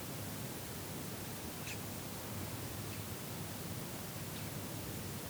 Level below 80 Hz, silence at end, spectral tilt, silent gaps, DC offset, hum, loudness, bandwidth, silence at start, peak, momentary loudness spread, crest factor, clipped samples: -62 dBFS; 0 s; -4 dB/octave; none; under 0.1%; none; -43 LUFS; over 20 kHz; 0 s; -30 dBFS; 1 LU; 14 dB; under 0.1%